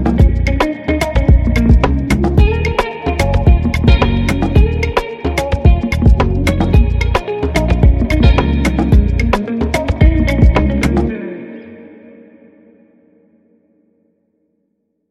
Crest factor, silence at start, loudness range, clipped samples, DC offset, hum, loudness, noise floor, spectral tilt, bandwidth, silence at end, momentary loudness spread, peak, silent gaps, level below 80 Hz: 12 dB; 0 s; 4 LU; under 0.1%; under 0.1%; none; -14 LUFS; -66 dBFS; -7 dB/octave; 12 kHz; 3.25 s; 6 LU; 0 dBFS; none; -16 dBFS